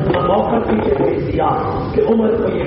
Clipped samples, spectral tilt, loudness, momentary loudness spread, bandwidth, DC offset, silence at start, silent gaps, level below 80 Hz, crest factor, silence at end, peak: under 0.1%; -6.5 dB/octave; -16 LUFS; 3 LU; 5.6 kHz; under 0.1%; 0 s; none; -34 dBFS; 12 dB; 0 s; -4 dBFS